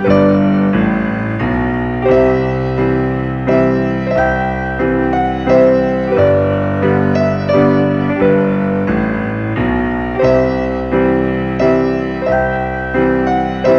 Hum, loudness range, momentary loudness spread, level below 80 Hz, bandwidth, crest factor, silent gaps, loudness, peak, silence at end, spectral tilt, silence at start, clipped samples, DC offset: none; 2 LU; 6 LU; -30 dBFS; 6.6 kHz; 14 dB; none; -14 LUFS; 0 dBFS; 0 s; -9 dB/octave; 0 s; under 0.1%; under 0.1%